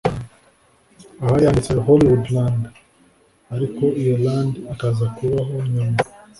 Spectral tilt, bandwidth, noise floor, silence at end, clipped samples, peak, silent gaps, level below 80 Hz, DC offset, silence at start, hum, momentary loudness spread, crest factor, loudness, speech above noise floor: -8 dB/octave; 11.5 kHz; -56 dBFS; 0.3 s; under 0.1%; -2 dBFS; none; -42 dBFS; under 0.1%; 0.05 s; none; 11 LU; 18 dB; -19 LUFS; 38 dB